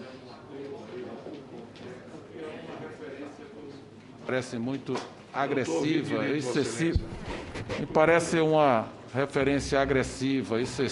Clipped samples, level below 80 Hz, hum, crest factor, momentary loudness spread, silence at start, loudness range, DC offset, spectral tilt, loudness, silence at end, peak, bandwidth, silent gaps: under 0.1%; -48 dBFS; none; 22 dB; 21 LU; 0 s; 16 LU; under 0.1%; -5.5 dB/octave; -28 LUFS; 0 s; -8 dBFS; 11.5 kHz; none